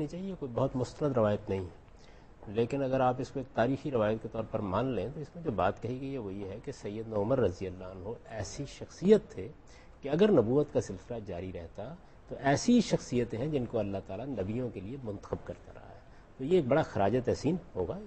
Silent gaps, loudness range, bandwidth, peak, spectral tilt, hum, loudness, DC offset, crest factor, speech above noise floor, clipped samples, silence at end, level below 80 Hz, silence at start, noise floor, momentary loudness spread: none; 5 LU; 8.4 kHz; -12 dBFS; -6.5 dB/octave; none; -32 LUFS; under 0.1%; 20 dB; 22 dB; under 0.1%; 0 s; -54 dBFS; 0 s; -53 dBFS; 16 LU